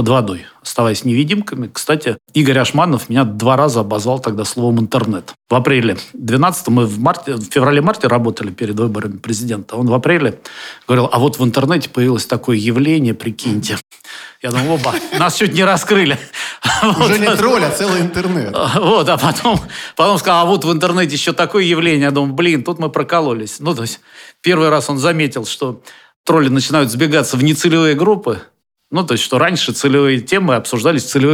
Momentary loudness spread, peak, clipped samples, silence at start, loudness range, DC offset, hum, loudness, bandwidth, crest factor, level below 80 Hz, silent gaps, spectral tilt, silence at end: 9 LU; 0 dBFS; under 0.1%; 0 s; 3 LU; under 0.1%; none; -14 LUFS; 18 kHz; 14 dB; -50 dBFS; 26.16-26.24 s; -5 dB/octave; 0 s